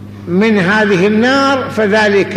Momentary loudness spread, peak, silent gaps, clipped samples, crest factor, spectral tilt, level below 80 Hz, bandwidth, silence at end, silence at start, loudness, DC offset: 3 LU; -2 dBFS; none; under 0.1%; 10 dB; -6 dB/octave; -50 dBFS; 11.5 kHz; 0 s; 0 s; -11 LUFS; under 0.1%